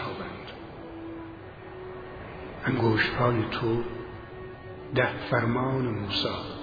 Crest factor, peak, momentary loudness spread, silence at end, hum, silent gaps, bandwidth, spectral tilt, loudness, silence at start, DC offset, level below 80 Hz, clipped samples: 20 dB; -10 dBFS; 17 LU; 0 s; none; none; 5 kHz; -7.5 dB/octave; -28 LUFS; 0 s; under 0.1%; -50 dBFS; under 0.1%